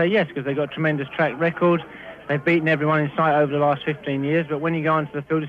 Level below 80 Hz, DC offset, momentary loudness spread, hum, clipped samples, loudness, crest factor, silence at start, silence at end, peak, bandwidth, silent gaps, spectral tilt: -60 dBFS; under 0.1%; 6 LU; none; under 0.1%; -21 LUFS; 14 dB; 0 s; 0 s; -8 dBFS; 5.4 kHz; none; -8.5 dB/octave